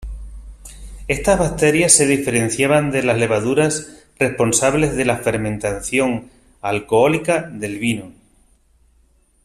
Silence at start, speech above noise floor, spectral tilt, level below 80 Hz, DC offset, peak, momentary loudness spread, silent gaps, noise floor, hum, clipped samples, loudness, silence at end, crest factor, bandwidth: 0 s; 39 dB; -4 dB/octave; -38 dBFS; under 0.1%; 0 dBFS; 13 LU; none; -56 dBFS; none; under 0.1%; -17 LUFS; 1.35 s; 18 dB; 15.5 kHz